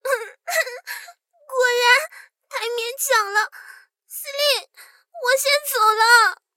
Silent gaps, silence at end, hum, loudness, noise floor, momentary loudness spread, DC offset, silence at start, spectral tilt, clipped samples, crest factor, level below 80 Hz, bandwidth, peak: none; 0.2 s; none; -19 LUFS; -50 dBFS; 18 LU; under 0.1%; 0.05 s; 4.5 dB/octave; under 0.1%; 20 dB; -78 dBFS; 17 kHz; -2 dBFS